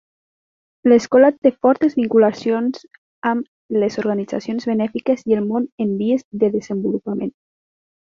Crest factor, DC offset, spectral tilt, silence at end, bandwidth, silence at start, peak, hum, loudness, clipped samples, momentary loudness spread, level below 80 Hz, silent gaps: 18 dB; under 0.1%; -7 dB/octave; 0.7 s; 7.4 kHz; 0.85 s; -2 dBFS; none; -19 LUFS; under 0.1%; 10 LU; -62 dBFS; 1.38-1.42 s, 2.98-3.22 s, 3.48-3.69 s, 5.72-5.78 s, 6.25-6.31 s